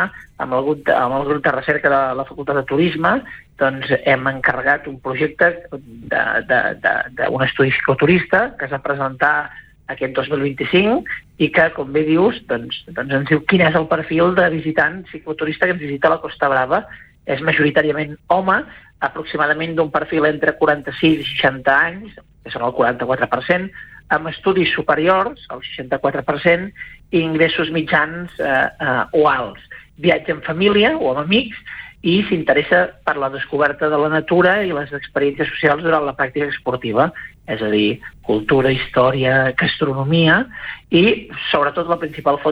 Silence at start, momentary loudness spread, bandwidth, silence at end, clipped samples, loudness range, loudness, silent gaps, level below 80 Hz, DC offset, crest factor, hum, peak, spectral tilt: 0 s; 10 LU; 5.6 kHz; 0 s; under 0.1%; 2 LU; -17 LUFS; none; -48 dBFS; under 0.1%; 16 dB; none; -2 dBFS; -8 dB/octave